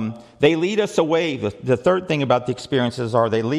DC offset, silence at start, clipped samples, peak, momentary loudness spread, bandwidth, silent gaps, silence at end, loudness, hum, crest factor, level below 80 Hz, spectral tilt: under 0.1%; 0 s; under 0.1%; -2 dBFS; 5 LU; 12 kHz; none; 0 s; -20 LUFS; none; 16 dB; -56 dBFS; -6 dB/octave